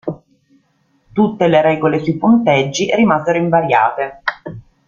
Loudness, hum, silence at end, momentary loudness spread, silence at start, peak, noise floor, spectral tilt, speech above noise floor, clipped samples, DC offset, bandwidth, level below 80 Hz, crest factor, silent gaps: -14 LUFS; none; 0.3 s; 12 LU; 0.05 s; 0 dBFS; -59 dBFS; -6 dB/octave; 46 dB; under 0.1%; under 0.1%; 7.4 kHz; -52 dBFS; 14 dB; none